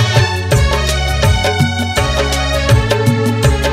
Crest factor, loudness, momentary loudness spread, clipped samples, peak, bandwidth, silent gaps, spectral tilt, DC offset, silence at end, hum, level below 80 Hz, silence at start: 12 dB; -13 LUFS; 2 LU; under 0.1%; 0 dBFS; 16 kHz; none; -5 dB/octave; under 0.1%; 0 s; none; -20 dBFS; 0 s